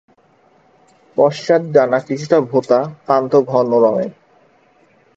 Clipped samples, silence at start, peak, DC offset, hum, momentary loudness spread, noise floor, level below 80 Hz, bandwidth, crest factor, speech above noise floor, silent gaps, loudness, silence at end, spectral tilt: under 0.1%; 1.15 s; 0 dBFS; under 0.1%; none; 6 LU; -54 dBFS; -64 dBFS; 7.8 kHz; 16 dB; 39 dB; none; -15 LUFS; 1.05 s; -7 dB/octave